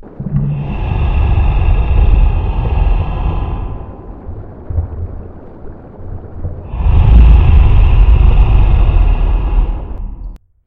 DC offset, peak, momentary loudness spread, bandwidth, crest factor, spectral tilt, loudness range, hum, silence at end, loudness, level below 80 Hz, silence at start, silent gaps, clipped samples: under 0.1%; 0 dBFS; 21 LU; 3.9 kHz; 10 dB; -10 dB/octave; 13 LU; none; 0.3 s; -13 LUFS; -12 dBFS; 0.05 s; none; 0.6%